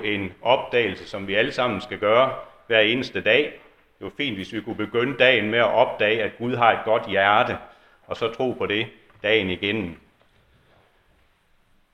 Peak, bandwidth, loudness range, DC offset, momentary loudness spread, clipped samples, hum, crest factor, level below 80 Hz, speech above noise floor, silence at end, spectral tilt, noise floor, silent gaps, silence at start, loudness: -2 dBFS; 10 kHz; 6 LU; under 0.1%; 12 LU; under 0.1%; none; 22 dB; -58 dBFS; 40 dB; 1.95 s; -5.5 dB/octave; -62 dBFS; none; 0 s; -22 LUFS